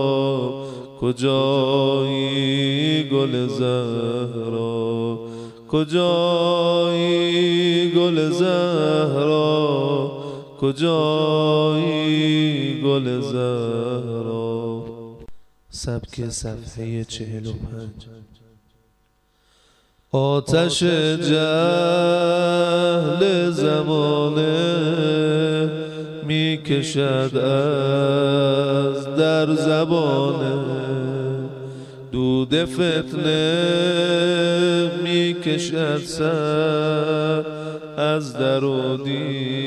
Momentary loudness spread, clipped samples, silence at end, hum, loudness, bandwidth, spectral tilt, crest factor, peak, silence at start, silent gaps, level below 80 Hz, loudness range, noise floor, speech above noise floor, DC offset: 11 LU; under 0.1%; 0 s; none; -20 LUFS; 12 kHz; -6 dB/octave; 14 dB; -6 dBFS; 0 s; none; -52 dBFS; 10 LU; -63 dBFS; 43 dB; under 0.1%